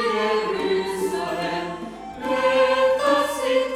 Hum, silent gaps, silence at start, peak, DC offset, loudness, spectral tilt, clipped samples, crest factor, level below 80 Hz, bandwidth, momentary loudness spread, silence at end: 50 Hz at -55 dBFS; none; 0 s; -8 dBFS; under 0.1%; -22 LUFS; -4 dB/octave; under 0.1%; 14 dB; -54 dBFS; 15 kHz; 12 LU; 0 s